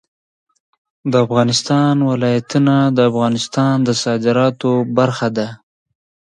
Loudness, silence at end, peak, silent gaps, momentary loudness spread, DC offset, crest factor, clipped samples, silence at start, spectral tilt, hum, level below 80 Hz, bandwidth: -15 LUFS; 0.65 s; 0 dBFS; none; 5 LU; under 0.1%; 16 dB; under 0.1%; 1.05 s; -6 dB/octave; none; -58 dBFS; 10.5 kHz